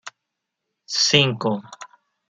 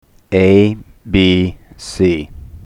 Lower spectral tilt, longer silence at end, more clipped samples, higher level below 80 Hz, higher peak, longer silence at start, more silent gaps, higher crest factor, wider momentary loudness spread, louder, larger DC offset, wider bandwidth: second, -3 dB/octave vs -6.5 dB/octave; first, 0.45 s vs 0.1 s; neither; second, -64 dBFS vs -36 dBFS; about the same, -2 dBFS vs 0 dBFS; second, 0.05 s vs 0.3 s; neither; first, 24 dB vs 14 dB; second, 14 LU vs 18 LU; second, -19 LUFS vs -14 LUFS; neither; about the same, 11 kHz vs 11 kHz